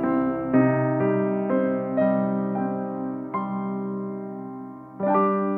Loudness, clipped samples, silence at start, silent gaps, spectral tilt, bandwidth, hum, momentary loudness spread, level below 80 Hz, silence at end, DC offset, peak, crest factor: -24 LUFS; under 0.1%; 0 s; none; -12 dB/octave; 3.6 kHz; none; 12 LU; -62 dBFS; 0 s; under 0.1%; -8 dBFS; 16 dB